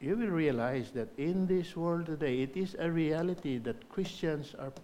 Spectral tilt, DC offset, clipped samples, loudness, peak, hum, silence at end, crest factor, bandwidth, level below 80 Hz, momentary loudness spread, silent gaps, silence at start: -7.5 dB/octave; under 0.1%; under 0.1%; -34 LUFS; -18 dBFS; none; 0 s; 16 dB; 14 kHz; -60 dBFS; 8 LU; none; 0 s